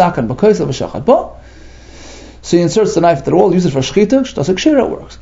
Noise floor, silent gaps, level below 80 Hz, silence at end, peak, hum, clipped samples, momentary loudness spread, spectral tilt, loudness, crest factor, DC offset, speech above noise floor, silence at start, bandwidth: -35 dBFS; none; -38 dBFS; 0.05 s; 0 dBFS; none; under 0.1%; 6 LU; -6 dB/octave; -13 LUFS; 14 dB; under 0.1%; 23 dB; 0 s; 8 kHz